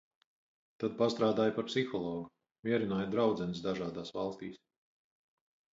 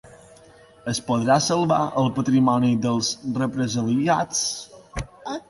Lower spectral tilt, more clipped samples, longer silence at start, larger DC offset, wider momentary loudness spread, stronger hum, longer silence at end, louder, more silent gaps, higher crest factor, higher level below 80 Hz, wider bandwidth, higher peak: first, -6.5 dB/octave vs -5 dB/octave; neither; first, 0.8 s vs 0.05 s; neither; about the same, 13 LU vs 15 LU; neither; first, 1.2 s vs 0.1 s; second, -34 LUFS vs -22 LUFS; first, 2.51-2.63 s vs none; about the same, 18 dB vs 16 dB; second, -68 dBFS vs -50 dBFS; second, 7.8 kHz vs 11.5 kHz; second, -16 dBFS vs -6 dBFS